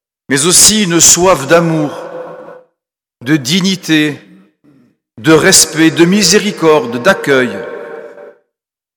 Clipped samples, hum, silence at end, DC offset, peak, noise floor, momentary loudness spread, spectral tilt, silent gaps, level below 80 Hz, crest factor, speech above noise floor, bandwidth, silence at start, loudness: 0.6%; none; 0.65 s; under 0.1%; 0 dBFS; -77 dBFS; 21 LU; -3 dB/octave; none; -44 dBFS; 12 dB; 68 dB; over 20 kHz; 0.3 s; -9 LUFS